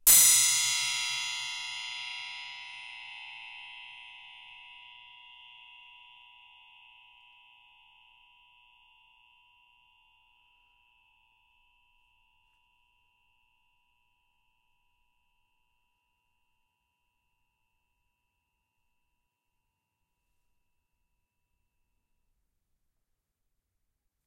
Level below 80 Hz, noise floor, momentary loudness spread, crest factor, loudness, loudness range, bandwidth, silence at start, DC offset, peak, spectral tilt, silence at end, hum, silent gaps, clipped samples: -70 dBFS; -83 dBFS; 29 LU; 30 dB; -25 LUFS; 27 LU; 16 kHz; 0.05 s; under 0.1%; -6 dBFS; 3 dB/octave; 19.5 s; none; none; under 0.1%